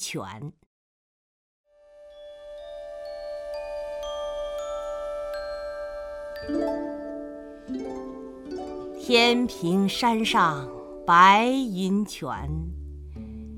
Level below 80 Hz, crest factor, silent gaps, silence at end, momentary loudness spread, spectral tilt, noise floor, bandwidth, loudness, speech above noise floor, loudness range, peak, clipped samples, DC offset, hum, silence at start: -46 dBFS; 22 dB; 0.66-1.64 s; 0 s; 20 LU; -4.5 dB/octave; -51 dBFS; 16.5 kHz; -25 LUFS; 28 dB; 17 LU; -4 dBFS; under 0.1%; under 0.1%; none; 0 s